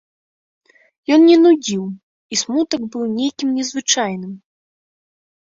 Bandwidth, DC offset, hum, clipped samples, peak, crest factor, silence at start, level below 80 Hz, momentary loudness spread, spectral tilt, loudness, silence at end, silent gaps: 7.8 kHz; under 0.1%; none; under 0.1%; -2 dBFS; 16 dB; 1.1 s; -66 dBFS; 19 LU; -3.5 dB/octave; -16 LUFS; 1.15 s; 2.03-2.30 s